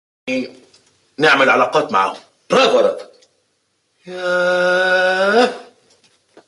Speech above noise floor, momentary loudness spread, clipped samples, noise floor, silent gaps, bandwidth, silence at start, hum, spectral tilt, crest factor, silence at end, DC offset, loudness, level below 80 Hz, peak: 51 dB; 17 LU; under 0.1%; -66 dBFS; none; 11.5 kHz; 0.25 s; none; -3.5 dB/octave; 16 dB; 0.85 s; under 0.1%; -15 LUFS; -66 dBFS; -2 dBFS